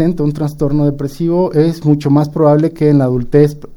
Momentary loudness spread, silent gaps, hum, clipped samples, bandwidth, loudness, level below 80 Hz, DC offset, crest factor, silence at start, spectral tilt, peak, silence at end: 5 LU; none; none; under 0.1%; 12.5 kHz; -13 LUFS; -34 dBFS; under 0.1%; 12 dB; 0 s; -9 dB/octave; 0 dBFS; 0 s